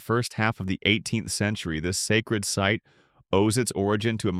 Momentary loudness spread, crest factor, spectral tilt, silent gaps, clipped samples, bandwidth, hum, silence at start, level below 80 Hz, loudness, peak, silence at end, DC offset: 4 LU; 20 dB; -4.5 dB/octave; none; under 0.1%; 15.5 kHz; none; 0 s; -52 dBFS; -25 LUFS; -6 dBFS; 0 s; under 0.1%